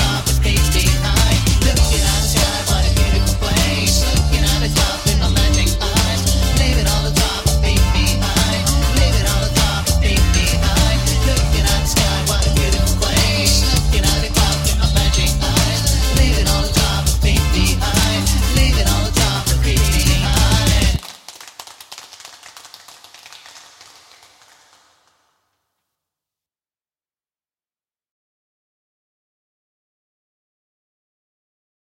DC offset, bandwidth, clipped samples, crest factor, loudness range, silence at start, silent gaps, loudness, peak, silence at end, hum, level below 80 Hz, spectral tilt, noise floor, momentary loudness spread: under 0.1%; 16.5 kHz; under 0.1%; 14 dB; 2 LU; 0 s; none; -16 LUFS; -2 dBFS; 8.35 s; none; -20 dBFS; -3.5 dB/octave; under -90 dBFS; 2 LU